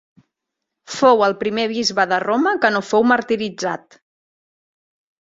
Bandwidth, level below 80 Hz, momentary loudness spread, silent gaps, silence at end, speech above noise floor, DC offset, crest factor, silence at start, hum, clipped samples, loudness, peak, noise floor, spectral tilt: 7.8 kHz; -62 dBFS; 11 LU; none; 1.45 s; 63 dB; under 0.1%; 18 dB; 0.9 s; none; under 0.1%; -18 LUFS; -2 dBFS; -81 dBFS; -4 dB/octave